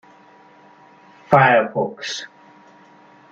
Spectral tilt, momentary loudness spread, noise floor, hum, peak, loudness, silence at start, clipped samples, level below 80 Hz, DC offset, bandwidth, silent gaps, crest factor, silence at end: -5 dB/octave; 17 LU; -49 dBFS; none; 0 dBFS; -18 LUFS; 1.3 s; under 0.1%; -64 dBFS; under 0.1%; 8 kHz; none; 22 dB; 1.05 s